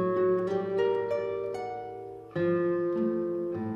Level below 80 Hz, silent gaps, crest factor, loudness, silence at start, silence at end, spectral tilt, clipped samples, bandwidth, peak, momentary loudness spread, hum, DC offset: -66 dBFS; none; 12 dB; -30 LUFS; 0 s; 0 s; -8.5 dB/octave; under 0.1%; 7 kHz; -16 dBFS; 11 LU; none; under 0.1%